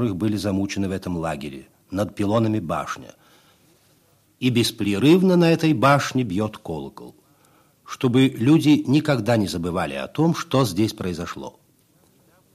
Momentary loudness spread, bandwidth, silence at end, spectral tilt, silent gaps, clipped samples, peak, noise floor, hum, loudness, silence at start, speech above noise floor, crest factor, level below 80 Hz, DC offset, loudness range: 15 LU; 15 kHz; 1.05 s; -6 dB/octave; none; under 0.1%; -4 dBFS; -60 dBFS; none; -21 LUFS; 0 s; 39 dB; 18 dB; -54 dBFS; under 0.1%; 6 LU